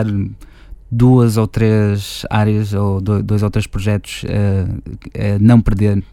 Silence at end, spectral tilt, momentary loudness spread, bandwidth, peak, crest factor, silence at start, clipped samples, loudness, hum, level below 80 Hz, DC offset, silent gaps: 0.1 s; -7.5 dB/octave; 11 LU; 14 kHz; 0 dBFS; 14 dB; 0 s; under 0.1%; -15 LUFS; none; -30 dBFS; under 0.1%; none